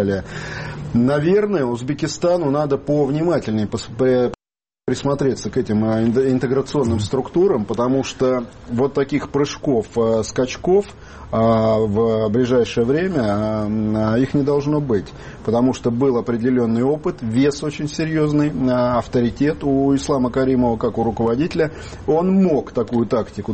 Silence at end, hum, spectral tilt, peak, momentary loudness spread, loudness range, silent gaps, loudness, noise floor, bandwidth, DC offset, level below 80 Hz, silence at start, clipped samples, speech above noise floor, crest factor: 0 s; none; -7 dB/octave; -6 dBFS; 6 LU; 2 LU; none; -19 LUFS; under -90 dBFS; 8.8 kHz; under 0.1%; -42 dBFS; 0 s; under 0.1%; over 72 dB; 12 dB